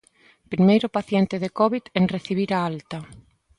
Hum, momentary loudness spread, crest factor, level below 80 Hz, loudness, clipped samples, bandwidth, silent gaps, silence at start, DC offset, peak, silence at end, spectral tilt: none; 14 LU; 18 dB; -58 dBFS; -22 LUFS; under 0.1%; 10.5 kHz; none; 0.5 s; under 0.1%; -6 dBFS; 0.4 s; -7.5 dB/octave